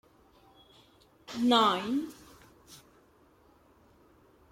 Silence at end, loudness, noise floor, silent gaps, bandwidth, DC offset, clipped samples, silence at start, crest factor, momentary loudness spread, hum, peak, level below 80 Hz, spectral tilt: 1.75 s; -28 LUFS; -63 dBFS; none; 16 kHz; under 0.1%; under 0.1%; 1.3 s; 22 dB; 27 LU; none; -12 dBFS; -70 dBFS; -4 dB/octave